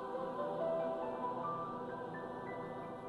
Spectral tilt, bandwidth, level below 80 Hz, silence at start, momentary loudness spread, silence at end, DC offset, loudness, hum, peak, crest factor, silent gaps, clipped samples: -7.5 dB/octave; 11.5 kHz; -72 dBFS; 0 s; 7 LU; 0 s; under 0.1%; -41 LUFS; none; -28 dBFS; 12 dB; none; under 0.1%